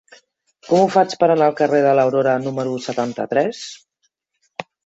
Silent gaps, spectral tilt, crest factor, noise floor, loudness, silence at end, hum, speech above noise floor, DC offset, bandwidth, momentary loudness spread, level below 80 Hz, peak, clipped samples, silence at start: none; -6 dB/octave; 18 dB; -70 dBFS; -17 LUFS; 0.25 s; none; 53 dB; under 0.1%; 8 kHz; 18 LU; -66 dBFS; -2 dBFS; under 0.1%; 0.65 s